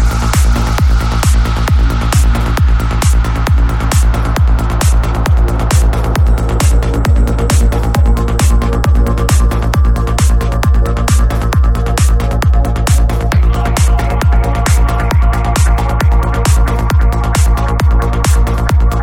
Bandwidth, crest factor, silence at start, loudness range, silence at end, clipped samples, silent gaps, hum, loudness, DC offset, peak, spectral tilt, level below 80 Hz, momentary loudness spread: 16.5 kHz; 10 dB; 0 s; 0 LU; 0 s; under 0.1%; none; none; -12 LUFS; under 0.1%; 0 dBFS; -5.5 dB/octave; -12 dBFS; 1 LU